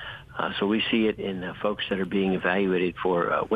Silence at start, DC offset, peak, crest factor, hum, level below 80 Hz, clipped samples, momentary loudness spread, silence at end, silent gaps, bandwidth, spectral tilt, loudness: 0 s; under 0.1%; -10 dBFS; 16 dB; none; -56 dBFS; under 0.1%; 7 LU; 0 s; none; 4.9 kHz; -7.5 dB/octave; -26 LUFS